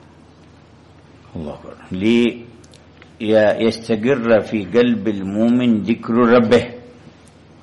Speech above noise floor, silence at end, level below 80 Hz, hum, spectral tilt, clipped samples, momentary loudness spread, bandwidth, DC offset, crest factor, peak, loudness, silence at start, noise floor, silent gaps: 30 dB; 0.75 s; -54 dBFS; none; -7 dB/octave; under 0.1%; 18 LU; 11 kHz; under 0.1%; 14 dB; -4 dBFS; -16 LUFS; 1.35 s; -46 dBFS; none